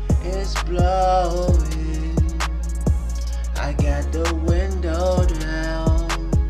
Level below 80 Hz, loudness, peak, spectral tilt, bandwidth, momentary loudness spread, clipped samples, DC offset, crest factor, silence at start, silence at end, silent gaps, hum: -22 dBFS; -22 LUFS; -6 dBFS; -6 dB/octave; 13 kHz; 6 LU; under 0.1%; 0.2%; 12 dB; 0 s; 0 s; none; none